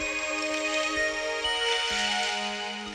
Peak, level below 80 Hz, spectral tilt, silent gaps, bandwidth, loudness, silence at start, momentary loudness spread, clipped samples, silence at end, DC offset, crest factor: -14 dBFS; -56 dBFS; -1 dB/octave; none; 13.5 kHz; -27 LUFS; 0 s; 4 LU; under 0.1%; 0 s; under 0.1%; 14 dB